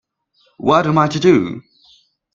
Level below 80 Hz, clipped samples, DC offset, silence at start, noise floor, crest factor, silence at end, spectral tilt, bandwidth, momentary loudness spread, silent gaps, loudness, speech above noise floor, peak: -52 dBFS; under 0.1%; under 0.1%; 0.6 s; -60 dBFS; 18 dB; 0.75 s; -6.5 dB/octave; 7.6 kHz; 12 LU; none; -15 LUFS; 46 dB; 0 dBFS